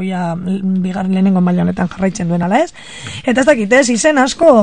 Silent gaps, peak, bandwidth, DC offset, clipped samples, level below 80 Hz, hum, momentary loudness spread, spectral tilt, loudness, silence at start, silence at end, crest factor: none; 0 dBFS; 10 kHz; 0.9%; under 0.1%; -46 dBFS; none; 9 LU; -5.5 dB/octave; -14 LUFS; 0 s; 0 s; 14 dB